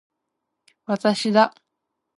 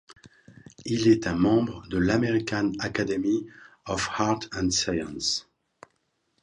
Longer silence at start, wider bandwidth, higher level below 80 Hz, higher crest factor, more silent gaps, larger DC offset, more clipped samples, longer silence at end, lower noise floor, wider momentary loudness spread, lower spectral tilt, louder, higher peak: first, 0.9 s vs 0.1 s; about the same, 11.5 kHz vs 10.5 kHz; second, -74 dBFS vs -50 dBFS; about the same, 22 dB vs 18 dB; neither; neither; neither; second, 0.7 s vs 1 s; first, -80 dBFS vs -74 dBFS; about the same, 11 LU vs 9 LU; about the same, -5 dB/octave vs -4.5 dB/octave; first, -21 LUFS vs -26 LUFS; first, -4 dBFS vs -8 dBFS